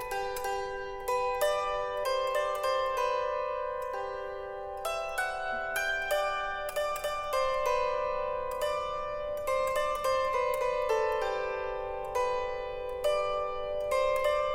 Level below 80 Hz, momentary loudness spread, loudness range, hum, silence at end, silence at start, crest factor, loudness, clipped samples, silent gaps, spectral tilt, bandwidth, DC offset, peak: -50 dBFS; 7 LU; 2 LU; none; 0 s; 0 s; 18 dB; -31 LUFS; under 0.1%; none; -2 dB/octave; 17 kHz; under 0.1%; -14 dBFS